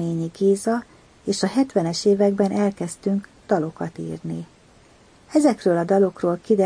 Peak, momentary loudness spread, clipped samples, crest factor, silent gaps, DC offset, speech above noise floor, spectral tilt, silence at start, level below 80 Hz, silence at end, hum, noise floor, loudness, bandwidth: -6 dBFS; 12 LU; under 0.1%; 16 dB; none; under 0.1%; 31 dB; -6 dB/octave; 0 s; -60 dBFS; 0 s; none; -52 dBFS; -22 LUFS; 10.5 kHz